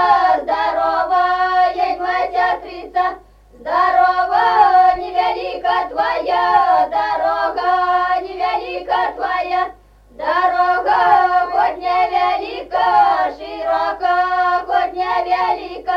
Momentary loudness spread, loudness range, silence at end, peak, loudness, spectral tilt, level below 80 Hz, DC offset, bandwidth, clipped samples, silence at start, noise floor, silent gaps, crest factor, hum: 8 LU; 3 LU; 0 s; -2 dBFS; -16 LUFS; -4 dB/octave; -48 dBFS; under 0.1%; 6.6 kHz; under 0.1%; 0 s; -42 dBFS; none; 14 dB; none